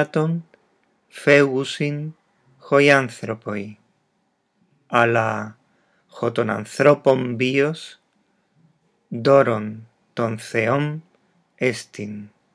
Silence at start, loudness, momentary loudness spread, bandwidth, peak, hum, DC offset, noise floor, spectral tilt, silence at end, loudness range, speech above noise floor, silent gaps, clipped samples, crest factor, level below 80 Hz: 0 s; -20 LUFS; 19 LU; 11 kHz; 0 dBFS; none; under 0.1%; -69 dBFS; -6 dB/octave; 0.3 s; 4 LU; 49 dB; none; under 0.1%; 22 dB; -78 dBFS